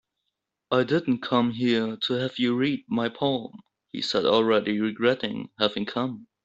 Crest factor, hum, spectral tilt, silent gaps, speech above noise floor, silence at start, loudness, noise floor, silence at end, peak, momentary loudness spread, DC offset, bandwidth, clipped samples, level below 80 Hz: 20 dB; none; -6 dB/octave; none; 57 dB; 0.7 s; -25 LUFS; -82 dBFS; 0.2 s; -6 dBFS; 9 LU; under 0.1%; 8 kHz; under 0.1%; -66 dBFS